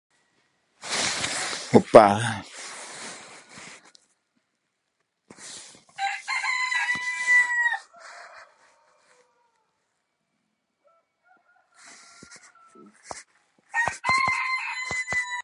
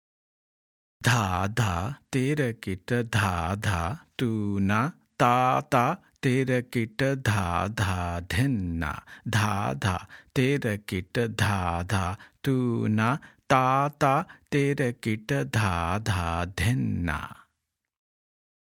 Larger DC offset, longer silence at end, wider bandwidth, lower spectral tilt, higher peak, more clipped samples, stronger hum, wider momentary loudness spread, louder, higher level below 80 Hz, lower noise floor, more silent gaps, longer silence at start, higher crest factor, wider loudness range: neither; second, 0 s vs 1.35 s; second, 11.5 kHz vs 17.5 kHz; second, -3.5 dB/octave vs -6 dB/octave; first, 0 dBFS vs -6 dBFS; neither; neither; first, 25 LU vs 7 LU; first, -22 LUFS vs -27 LUFS; second, -62 dBFS vs -52 dBFS; second, -77 dBFS vs -82 dBFS; neither; second, 0.8 s vs 1 s; first, 28 dB vs 22 dB; first, 17 LU vs 3 LU